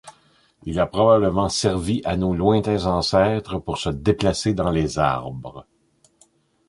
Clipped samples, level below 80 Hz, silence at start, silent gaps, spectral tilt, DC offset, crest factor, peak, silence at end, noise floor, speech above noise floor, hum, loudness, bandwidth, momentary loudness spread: under 0.1%; -40 dBFS; 0.05 s; none; -5.5 dB/octave; under 0.1%; 18 dB; -4 dBFS; 1.05 s; -59 dBFS; 39 dB; none; -21 LUFS; 11.5 kHz; 11 LU